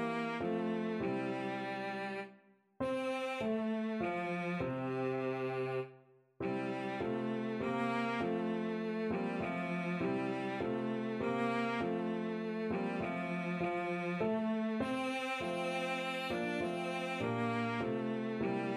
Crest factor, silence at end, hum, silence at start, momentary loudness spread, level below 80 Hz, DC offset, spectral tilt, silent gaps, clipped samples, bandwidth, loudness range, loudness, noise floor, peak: 14 dB; 0 s; none; 0 s; 3 LU; -70 dBFS; under 0.1%; -6.5 dB/octave; none; under 0.1%; 12.5 kHz; 2 LU; -37 LUFS; -64 dBFS; -22 dBFS